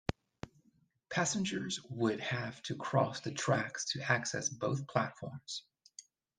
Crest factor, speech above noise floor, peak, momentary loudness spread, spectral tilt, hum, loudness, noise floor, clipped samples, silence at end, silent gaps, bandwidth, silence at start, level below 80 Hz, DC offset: 24 dB; 37 dB; -12 dBFS; 19 LU; -4 dB/octave; none; -36 LUFS; -72 dBFS; under 0.1%; 0.35 s; none; 10 kHz; 0.1 s; -66 dBFS; under 0.1%